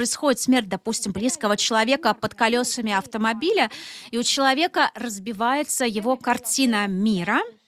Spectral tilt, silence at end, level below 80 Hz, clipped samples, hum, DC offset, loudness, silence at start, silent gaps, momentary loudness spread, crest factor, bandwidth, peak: -3 dB/octave; 0.15 s; -62 dBFS; under 0.1%; none; under 0.1%; -22 LUFS; 0 s; none; 6 LU; 16 dB; 16 kHz; -6 dBFS